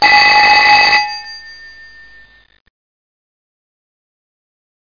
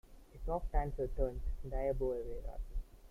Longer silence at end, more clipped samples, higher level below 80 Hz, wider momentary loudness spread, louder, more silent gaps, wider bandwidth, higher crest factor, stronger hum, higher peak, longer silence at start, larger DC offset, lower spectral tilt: first, 3.4 s vs 0.05 s; neither; second, -48 dBFS vs -40 dBFS; first, 21 LU vs 11 LU; first, -7 LUFS vs -41 LUFS; neither; first, 5.2 kHz vs 3.4 kHz; about the same, 14 dB vs 18 dB; neither; first, 0 dBFS vs -20 dBFS; about the same, 0 s vs 0.05 s; first, 0.5% vs under 0.1%; second, -0.5 dB/octave vs -9 dB/octave